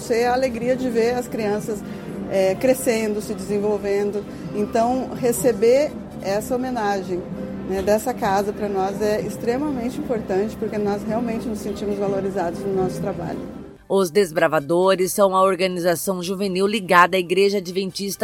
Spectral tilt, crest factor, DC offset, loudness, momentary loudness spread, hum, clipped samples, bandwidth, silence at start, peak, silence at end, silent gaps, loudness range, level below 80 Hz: -5 dB/octave; 20 dB; under 0.1%; -21 LUFS; 9 LU; none; under 0.1%; 17 kHz; 0 s; 0 dBFS; 0 s; none; 5 LU; -48 dBFS